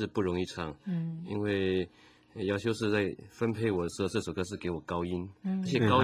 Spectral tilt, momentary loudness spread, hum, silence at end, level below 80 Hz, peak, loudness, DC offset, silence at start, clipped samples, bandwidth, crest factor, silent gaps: -6.5 dB/octave; 7 LU; none; 0 s; -54 dBFS; -12 dBFS; -33 LUFS; under 0.1%; 0 s; under 0.1%; 15 kHz; 20 dB; none